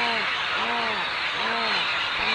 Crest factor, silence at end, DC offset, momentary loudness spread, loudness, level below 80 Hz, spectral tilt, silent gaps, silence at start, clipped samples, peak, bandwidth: 14 dB; 0 s; under 0.1%; 2 LU; -24 LUFS; -58 dBFS; -2 dB/octave; none; 0 s; under 0.1%; -12 dBFS; 11 kHz